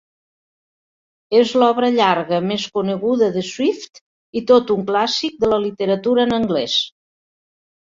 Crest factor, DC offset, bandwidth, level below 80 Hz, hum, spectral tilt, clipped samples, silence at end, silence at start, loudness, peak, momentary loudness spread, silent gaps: 18 dB; under 0.1%; 7.6 kHz; -56 dBFS; none; -5 dB/octave; under 0.1%; 1.05 s; 1.3 s; -18 LUFS; -2 dBFS; 6 LU; 4.01-4.33 s